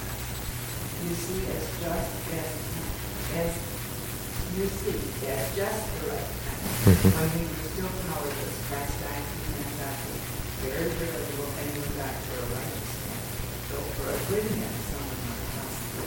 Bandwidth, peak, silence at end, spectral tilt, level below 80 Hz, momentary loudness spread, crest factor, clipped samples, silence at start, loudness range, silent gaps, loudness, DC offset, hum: 17 kHz; -6 dBFS; 0 s; -5 dB/octave; -40 dBFS; 5 LU; 24 dB; under 0.1%; 0 s; 5 LU; none; -30 LUFS; under 0.1%; none